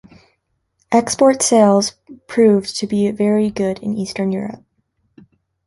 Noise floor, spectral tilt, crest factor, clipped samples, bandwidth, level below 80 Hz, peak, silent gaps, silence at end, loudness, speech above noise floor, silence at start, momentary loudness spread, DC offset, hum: -68 dBFS; -5 dB/octave; 16 dB; under 0.1%; 11.5 kHz; -56 dBFS; -2 dBFS; none; 1.1 s; -16 LUFS; 52 dB; 0.9 s; 11 LU; under 0.1%; none